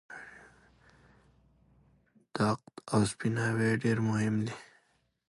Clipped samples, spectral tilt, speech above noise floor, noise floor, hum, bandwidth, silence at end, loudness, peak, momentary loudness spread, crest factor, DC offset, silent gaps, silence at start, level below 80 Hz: under 0.1%; -6 dB/octave; 42 dB; -72 dBFS; none; 11.5 kHz; 0.65 s; -31 LUFS; -14 dBFS; 18 LU; 20 dB; under 0.1%; none; 0.1 s; -64 dBFS